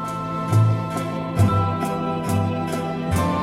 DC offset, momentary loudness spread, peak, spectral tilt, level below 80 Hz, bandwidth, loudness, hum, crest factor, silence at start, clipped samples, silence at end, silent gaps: under 0.1%; 7 LU; -6 dBFS; -7 dB/octave; -44 dBFS; 15 kHz; -22 LUFS; none; 14 dB; 0 s; under 0.1%; 0 s; none